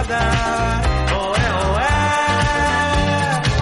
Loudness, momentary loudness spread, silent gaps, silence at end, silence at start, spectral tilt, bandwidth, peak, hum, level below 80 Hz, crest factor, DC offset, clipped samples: -18 LUFS; 2 LU; none; 0 s; 0 s; -5 dB/octave; 11.5 kHz; -4 dBFS; none; -24 dBFS; 12 dB; under 0.1%; under 0.1%